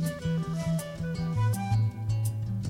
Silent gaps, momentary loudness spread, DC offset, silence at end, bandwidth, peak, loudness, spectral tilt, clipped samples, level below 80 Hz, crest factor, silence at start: none; 4 LU; under 0.1%; 0 s; 15.5 kHz; -16 dBFS; -30 LUFS; -7 dB/octave; under 0.1%; -48 dBFS; 12 dB; 0 s